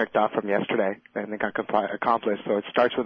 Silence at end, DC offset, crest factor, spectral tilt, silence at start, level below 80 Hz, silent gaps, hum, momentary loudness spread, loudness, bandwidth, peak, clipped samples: 0 s; under 0.1%; 18 dB; -8 dB/octave; 0 s; -68 dBFS; none; none; 5 LU; -26 LUFS; 6 kHz; -8 dBFS; under 0.1%